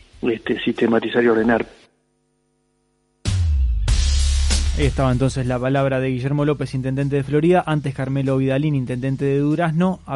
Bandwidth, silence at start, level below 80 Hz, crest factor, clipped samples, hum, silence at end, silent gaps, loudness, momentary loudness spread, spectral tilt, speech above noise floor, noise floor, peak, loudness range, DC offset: 11.5 kHz; 0.2 s; -26 dBFS; 14 dB; under 0.1%; 50 Hz at -45 dBFS; 0 s; none; -20 LUFS; 6 LU; -6.5 dB/octave; 47 dB; -66 dBFS; -6 dBFS; 3 LU; under 0.1%